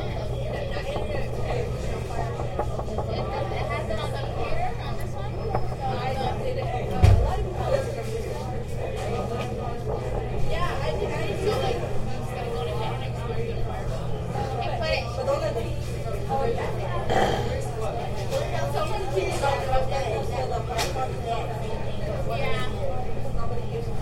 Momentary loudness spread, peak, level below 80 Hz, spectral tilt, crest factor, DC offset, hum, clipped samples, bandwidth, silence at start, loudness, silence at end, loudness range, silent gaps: 6 LU; -4 dBFS; -34 dBFS; -6 dB/octave; 22 dB; under 0.1%; none; under 0.1%; 15 kHz; 0 s; -28 LUFS; 0 s; 4 LU; none